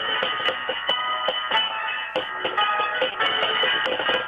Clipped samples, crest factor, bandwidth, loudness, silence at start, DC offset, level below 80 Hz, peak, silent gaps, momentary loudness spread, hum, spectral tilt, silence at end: under 0.1%; 14 dB; 11 kHz; -22 LUFS; 0 s; under 0.1%; -64 dBFS; -10 dBFS; none; 6 LU; none; -3 dB/octave; 0 s